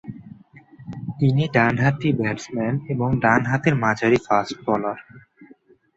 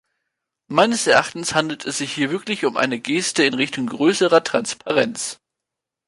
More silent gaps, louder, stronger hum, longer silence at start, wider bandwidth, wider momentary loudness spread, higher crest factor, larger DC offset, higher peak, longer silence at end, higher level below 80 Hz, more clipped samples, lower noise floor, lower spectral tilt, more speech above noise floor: neither; about the same, -21 LUFS vs -19 LUFS; neither; second, 0.05 s vs 0.7 s; second, 7.8 kHz vs 11.5 kHz; first, 16 LU vs 7 LU; about the same, 20 dB vs 18 dB; neither; about the same, -2 dBFS vs -2 dBFS; second, 0.5 s vs 0.75 s; first, -52 dBFS vs -64 dBFS; neither; second, -53 dBFS vs -84 dBFS; first, -7 dB/octave vs -3 dB/octave; second, 32 dB vs 65 dB